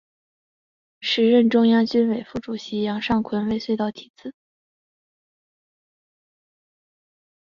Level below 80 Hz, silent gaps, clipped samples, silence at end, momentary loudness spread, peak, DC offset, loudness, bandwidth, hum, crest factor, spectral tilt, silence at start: -58 dBFS; 4.10-4.14 s; under 0.1%; 3.25 s; 18 LU; -6 dBFS; under 0.1%; -21 LUFS; 7.2 kHz; none; 18 dB; -6.5 dB/octave; 1 s